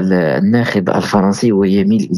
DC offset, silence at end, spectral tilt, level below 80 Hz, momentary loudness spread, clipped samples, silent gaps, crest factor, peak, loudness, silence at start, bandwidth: under 0.1%; 0 s; -7 dB/octave; -52 dBFS; 2 LU; under 0.1%; none; 12 dB; -2 dBFS; -13 LUFS; 0 s; 12 kHz